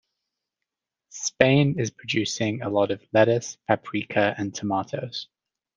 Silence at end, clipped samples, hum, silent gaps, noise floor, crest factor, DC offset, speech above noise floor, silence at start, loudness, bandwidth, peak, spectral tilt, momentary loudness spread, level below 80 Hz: 0.5 s; under 0.1%; none; none; -86 dBFS; 24 dB; under 0.1%; 62 dB; 1.15 s; -24 LUFS; 9.6 kHz; -2 dBFS; -5 dB/octave; 12 LU; -62 dBFS